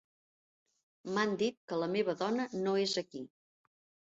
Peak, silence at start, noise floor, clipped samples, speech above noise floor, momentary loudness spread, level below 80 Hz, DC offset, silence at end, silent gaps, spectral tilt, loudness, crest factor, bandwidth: -18 dBFS; 1.05 s; under -90 dBFS; under 0.1%; over 56 dB; 15 LU; -80 dBFS; under 0.1%; 0.85 s; 1.57-1.68 s; -3.5 dB/octave; -34 LUFS; 18 dB; 8 kHz